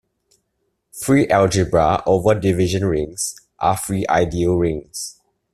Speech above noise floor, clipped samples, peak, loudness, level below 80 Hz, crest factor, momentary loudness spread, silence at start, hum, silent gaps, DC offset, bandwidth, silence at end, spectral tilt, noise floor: 54 dB; under 0.1%; -2 dBFS; -18 LUFS; -42 dBFS; 16 dB; 12 LU; 0.95 s; none; none; under 0.1%; 14.5 kHz; 0.45 s; -5.5 dB/octave; -71 dBFS